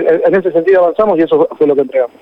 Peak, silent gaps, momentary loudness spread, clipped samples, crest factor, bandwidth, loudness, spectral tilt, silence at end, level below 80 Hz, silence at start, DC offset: -2 dBFS; none; 3 LU; under 0.1%; 8 dB; 5.2 kHz; -11 LUFS; -8.5 dB/octave; 0.15 s; -52 dBFS; 0 s; under 0.1%